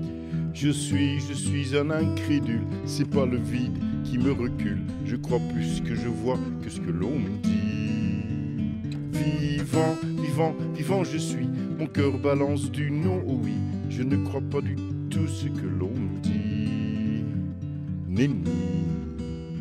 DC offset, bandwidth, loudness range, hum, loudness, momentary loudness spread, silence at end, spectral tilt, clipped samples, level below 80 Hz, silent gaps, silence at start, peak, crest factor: under 0.1%; 13.5 kHz; 2 LU; none; -27 LUFS; 6 LU; 0 s; -7 dB/octave; under 0.1%; -48 dBFS; none; 0 s; -10 dBFS; 16 dB